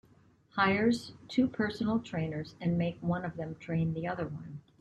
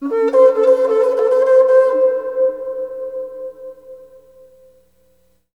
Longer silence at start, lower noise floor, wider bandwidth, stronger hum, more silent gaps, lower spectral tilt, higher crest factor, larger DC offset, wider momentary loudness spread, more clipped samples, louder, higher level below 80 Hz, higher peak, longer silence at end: first, 0.55 s vs 0 s; first, -63 dBFS vs -59 dBFS; first, 9.8 kHz vs 6 kHz; second, none vs 60 Hz at -65 dBFS; neither; first, -7 dB/octave vs -4.5 dB/octave; about the same, 18 dB vs 14 dB; second, under 0.1% vs 0.1%; second, 11 LU vs 19 LU; neither; second, -32 LUFS vs -14 LUFS; about the same, -62 dBFS vs -64 dBFS; second, -14 dBFS vs -2 dBFS; second, 0.2 s vs 1.6 s